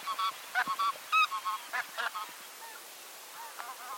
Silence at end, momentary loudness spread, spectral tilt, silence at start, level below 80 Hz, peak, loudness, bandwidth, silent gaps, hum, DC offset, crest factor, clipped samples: 0 s; 18 LU; 1 dB/octave; 0 s; under -90 dBFS; -16 dBFS; -33 LUFS; 17 kHz; none; none; under 0.1%; 20 dB; under 0.1%